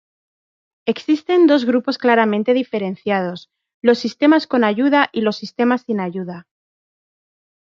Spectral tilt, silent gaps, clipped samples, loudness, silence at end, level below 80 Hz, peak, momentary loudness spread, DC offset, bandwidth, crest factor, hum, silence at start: -6.5 dB/octave; 3.74-3.81 s; under 0.1%; -17 LUFS; 1.25 s; -68 dBFS; -2 dBFS; 12 LU; under 0.1%; 7.2 kHz; 16 dB; none; 0.85 s